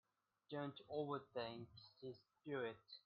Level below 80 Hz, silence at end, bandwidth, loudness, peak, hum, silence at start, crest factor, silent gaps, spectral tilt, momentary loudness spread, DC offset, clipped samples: -86 dBFS; 0.1 s; 5.4 kHz; -50 LUFS; -32 dBFS; none; 0.5 s; 18 dB; none; -4.5 dB/octave; 11 LU; under 0.1%; under 0.1%